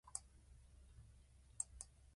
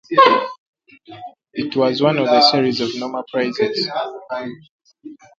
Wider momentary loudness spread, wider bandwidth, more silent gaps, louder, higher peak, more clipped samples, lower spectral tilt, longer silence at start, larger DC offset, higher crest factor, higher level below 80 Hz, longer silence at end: about the same, 20 LU vs 18 LU; first, 11.5 kHz vs 7.6 kHz; second, none vs 0.58-0.73 s, 4.69-4.79 s; second, -50 LUFS vs -17 LUFS; second, -26 dBFS vs 0 dBFS; neither; second, -1.5 dB/octave vs -5 dB/octave; about the same, 0.05 s vs 0.1 s; neither; first, 30 dB vs 18 dB; about the same, -66 dBFS vs -64 dBFS; second, 0 s vs 0.25 s